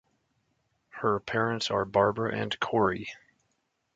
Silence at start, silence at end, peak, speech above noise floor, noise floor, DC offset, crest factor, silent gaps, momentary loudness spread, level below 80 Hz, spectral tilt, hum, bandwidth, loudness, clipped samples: 0.95 s; 0.8 s; -10 dBFS; 49 dB; -77 dBFS; under 0.1%; 22 dB; none; 10 LU; -60 dBFS; -5.5 dB/octave; none; 9.2 kHz; -28 LUFS; under 0.1%